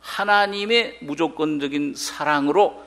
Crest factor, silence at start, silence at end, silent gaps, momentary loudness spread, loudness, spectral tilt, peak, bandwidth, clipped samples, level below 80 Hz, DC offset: 18 dB; 0.05 s; 0 s; none; 7 LU; -21 LUFS; -3.5 dB/octave; -4 dBFS; 15.5 kHz; under 0.1%; -62 dBFS; under 0.1%